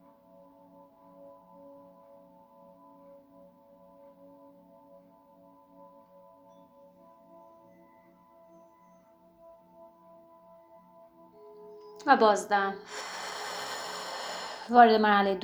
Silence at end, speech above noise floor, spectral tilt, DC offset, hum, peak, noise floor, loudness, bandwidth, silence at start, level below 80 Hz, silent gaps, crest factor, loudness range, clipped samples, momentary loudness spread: 0 s; 37 dB; -4 dB/octave; under 0.1%; none; -6 dBFS; -60 dBFS; -26 LUFS; over 20 kHz; 1.25 s; -76 dBFS; none; 28 dB; 7 LU; under 0.1%; 29 LU